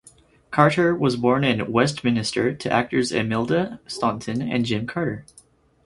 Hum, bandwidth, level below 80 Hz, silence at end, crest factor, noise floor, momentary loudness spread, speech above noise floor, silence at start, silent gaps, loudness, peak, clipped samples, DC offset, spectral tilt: none; 11.5 kHz; -54 dBFS; 0.65 s; 22 dB; -53 dBFS; 8 LU; 32 dB; 0.5 s; none; -22 LUFS; 0 dBFS; under 0.1%; under 0.1%; -5.5 dB/octave